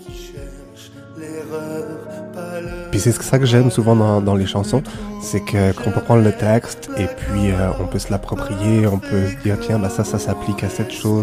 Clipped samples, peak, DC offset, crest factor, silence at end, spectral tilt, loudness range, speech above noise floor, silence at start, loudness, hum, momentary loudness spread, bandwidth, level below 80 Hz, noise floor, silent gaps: under 0.1%; -2 dBFS; under 0.1%; 16 dB; 0 s; -6.5 dB/octave; 3 LU; 22 dB; 0 s; -19 LUFS; none; 17 LU; 15.5 kHz; -36 dBFS; -39 dBFS; none